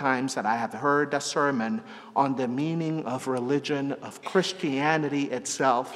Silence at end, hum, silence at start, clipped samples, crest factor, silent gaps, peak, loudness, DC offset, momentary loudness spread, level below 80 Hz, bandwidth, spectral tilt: 0 s; none; 0 s; under 0.1%; 20 dB; none; -8 dBFS; -27 LUFS; under 0.1%; 6 LU; -78 dBFS; 13.5 kHz; -4.5 dB/octave